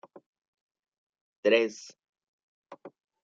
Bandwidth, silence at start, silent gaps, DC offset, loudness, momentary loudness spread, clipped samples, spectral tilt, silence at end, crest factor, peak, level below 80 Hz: 7.8 kHz; 1.45 s; 2.09-2.13 s, 2.28-2.62 s; under 0.1%; -27 LUFS; 26 LU; under 0.1%; -3.5 dB/octave; 0.35 s; 24 dB; -10 dBFS; -88 dBFS